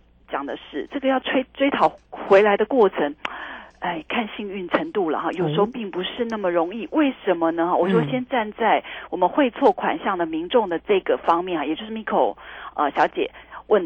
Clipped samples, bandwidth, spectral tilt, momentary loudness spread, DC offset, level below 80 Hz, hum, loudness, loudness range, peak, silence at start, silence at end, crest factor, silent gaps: under 0.1%; 7.8 kHz; -7 dB/octave; 12 LU; under 0.1%; -56 dBFS; none; -22 LUFS; 3 LU; -4 dBFS; 0.3 s; 0 s; 18 dB; none